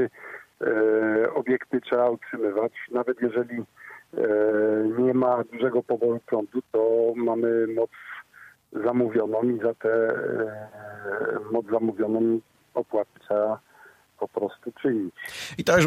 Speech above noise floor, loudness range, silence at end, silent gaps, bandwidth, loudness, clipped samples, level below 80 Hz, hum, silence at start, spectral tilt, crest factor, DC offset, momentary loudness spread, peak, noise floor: 29 dB; 4 LU; 0 s; none; 14.5 kHz; -25 LUFS; under 0.1%; -64 dBFS; none; 0 s; -6 dB/octave; 18 dB; under 0.1%; 13 LU; -8 dBFS; -54 dBFS